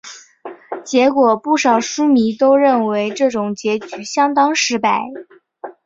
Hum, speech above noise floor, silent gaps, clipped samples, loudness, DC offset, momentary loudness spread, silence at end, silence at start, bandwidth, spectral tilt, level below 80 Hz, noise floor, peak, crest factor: none; 21 dB; none; under 0.1%; -15 LUFS; under 0.1%; 22 LU; 0.15 s; 0.05 s; 7.8 kHz; -3.5 dB/octave; -62 dBFS; -36 dBFS; -2 dBFS; 14 dB